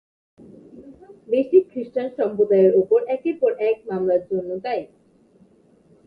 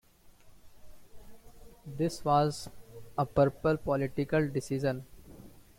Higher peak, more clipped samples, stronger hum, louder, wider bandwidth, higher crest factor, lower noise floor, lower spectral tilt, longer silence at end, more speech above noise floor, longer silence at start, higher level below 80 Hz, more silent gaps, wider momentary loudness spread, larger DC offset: first, -4 dBFS vs -14 dBFS; neither; neither; first, -21 LUFS vs -31 LUFS; second, 5 kHz vs 16.5 kHz; about the same, 18 dB vs 18 dB; about the same, -55 dBFS vs -57 dBFS; first, -9.5 dB/octave vs -6.5 dB/octave; first, 1.2 s vs 0.2 s; first, 35 dB vs 27 dB; first, 0.75 s vs 0.25 s; second, -66 dBFS vs -54 dBFS; neither; second, 11 LU vs 19 LU; neither